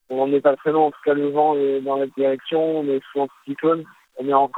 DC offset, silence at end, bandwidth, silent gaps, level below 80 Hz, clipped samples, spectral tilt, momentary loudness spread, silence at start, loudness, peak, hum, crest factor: under 0.1%; 0 s; 4.1 kHz; none; -80 dBFS; under 0.1%; -8 dB/octave; 8 LU; 0.1 s; -21 LUFS; -2 dBFS; none; 18 dB